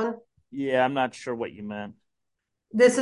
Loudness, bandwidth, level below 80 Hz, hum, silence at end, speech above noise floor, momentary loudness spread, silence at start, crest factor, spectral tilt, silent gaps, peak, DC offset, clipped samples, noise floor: -26 LUFS; 11.5 kHz; -68 dBFS; none; 0 s; 57 dB; 20 LU; 0 s; 20 dB; -4.5 dB/octave; none; -6 dBFS; under 0.1%; under 0.1%; -81 dBFS